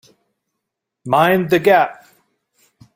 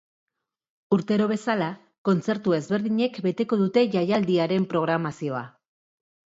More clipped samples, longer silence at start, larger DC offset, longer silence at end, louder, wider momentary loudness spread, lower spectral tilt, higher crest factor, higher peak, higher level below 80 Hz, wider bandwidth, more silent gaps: neither; first, 1.05 s vs 0.9 s; neither; first, 1.05 s vs 0.85 s; first, -15 LUFS vs -24 LUFS; about the same, 9 LU vs 8 LU; about the same, -6 dB/octave vs -7 dB/octave; about the same, 18 dB vs 18 dB; first, -2 dBFS vs -8 dBFS; first, -58 dBFS vs -70 dBFS; first, 16.5 kHz vs 7.8 kHz; second, none vs 1.98-2.05 s